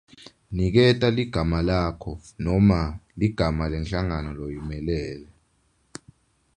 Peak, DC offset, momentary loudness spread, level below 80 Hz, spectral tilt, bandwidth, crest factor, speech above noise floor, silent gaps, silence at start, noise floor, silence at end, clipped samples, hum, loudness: -4 dBFS; under 0.1%; 18 LU; -36 dBFS; -7.5 dB/octave; 10 kHz; 20 dB; 43 dB; none; 0.5 s; -66 dBFS; 1.35 s; under 0.1%; none; -24 LUFS